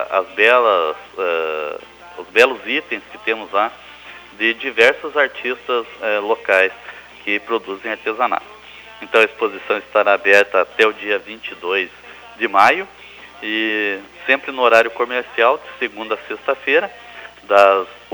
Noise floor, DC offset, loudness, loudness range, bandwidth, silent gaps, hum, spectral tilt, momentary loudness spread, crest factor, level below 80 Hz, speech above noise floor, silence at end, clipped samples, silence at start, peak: -39 dBFS; under 0.1%; -17 LUFS; 3 LU; over 20 kHz; none; 60 Hz at -60 dBFS; -3 dB/octave; 22 LU; 18 dB; -60 dBFS; 22 dB; 0.15 s; under 0.1%; 0 s; 0 dBFS